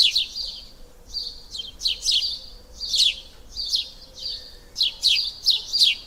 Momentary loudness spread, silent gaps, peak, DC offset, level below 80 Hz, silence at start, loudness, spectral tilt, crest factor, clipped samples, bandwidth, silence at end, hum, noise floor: 17 LU; none; -4 dBFS; under 0.1%; -48 dBFS; 0 s; -21 LUFS; 2 dB/octave; 22 dB; under 0.1%; over 20 kHz; 0 s; none; -44 dBFS